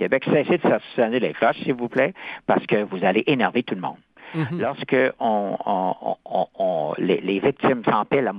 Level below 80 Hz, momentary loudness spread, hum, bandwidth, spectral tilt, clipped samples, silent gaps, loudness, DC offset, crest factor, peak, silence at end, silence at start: -64 dBFS; 7 LU; none; 5.2 kHz; -9 dB/octave; under 0.1%; none; -22 LUFS; under 0.1%; 16 dB; -4 dBFS; 0 s; 0 s